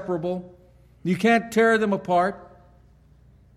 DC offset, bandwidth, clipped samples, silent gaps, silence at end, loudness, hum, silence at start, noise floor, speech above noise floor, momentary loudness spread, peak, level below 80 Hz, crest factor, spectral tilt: under 0.1%; 14.5 kHz; under 0.1%; none; 1.1 s; -22 LUFS; none; 0 s; -54 dBFS; 32 dB; 14 LU; -6 dBFS; -58 dBFS; 18 dB; -6 dB/octave